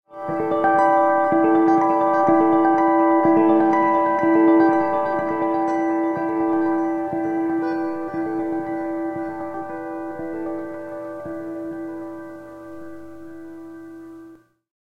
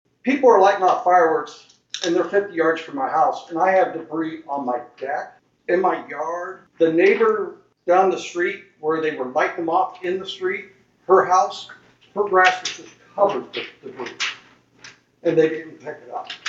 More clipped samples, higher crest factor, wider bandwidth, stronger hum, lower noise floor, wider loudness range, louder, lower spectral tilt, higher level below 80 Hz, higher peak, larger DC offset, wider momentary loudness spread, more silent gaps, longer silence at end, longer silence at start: neither; about the same, 16 dB vs 20 dB; second, 6.2 kHz vs 7.8 kHz; neither; second, -46 dBFS vs -50 dBFS; first, 17 LU vs 4 LU; about the same, -20 LUFS vs -20 LUFS; first, -8 dB/octave vs -4 dB/octave; first, -60 dBFS vs -72 dBFS; second, -6 dBFS vs -2 dBFS; neither; first, 22 LU vs 18 LU; neither; first, 0.5 s vs 0 s; second, 0.1 s vs 0.25 s